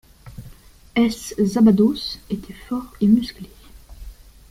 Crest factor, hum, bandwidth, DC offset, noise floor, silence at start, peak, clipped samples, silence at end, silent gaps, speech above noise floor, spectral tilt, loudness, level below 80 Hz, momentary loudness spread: 16 dB; none; 15.5 kHz; under 0.1%; -45 dBFS; 0.25 s; -4 dBFS; under 0.1%; 0.4 s; none; 26 dB; -6.5 dB/octave; -20 LUFS; -44 dBFS; 26 LU